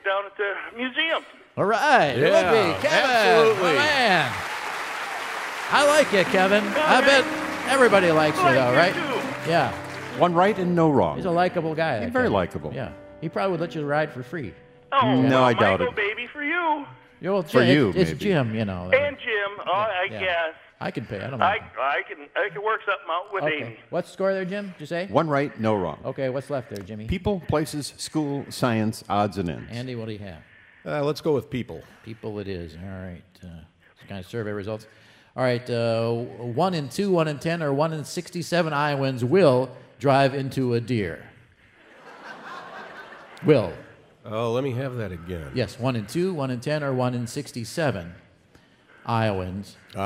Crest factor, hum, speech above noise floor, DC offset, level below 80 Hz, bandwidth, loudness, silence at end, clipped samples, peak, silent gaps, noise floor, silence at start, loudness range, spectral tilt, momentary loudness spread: 20 dB; none; 33 dB; under 0.1%; -54 dBFS; 16 kHz; -23 LUFS; 0 s; under 0.1%; -4 dBFS; none; -56 dBFS; 0.05 s; 10 LU; -5.5 dB/octave; 17 LU